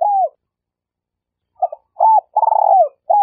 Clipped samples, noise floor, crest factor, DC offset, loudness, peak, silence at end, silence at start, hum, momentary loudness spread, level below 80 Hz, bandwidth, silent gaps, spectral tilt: under 0.1%; -84 dBFS; 14 dB; under 0.1%; -15 LUFS; -2 dBFS; 0 s; 0 s; none; 11 LU; -82 dBFS; 1.5 kHz; none; -5 dB/octave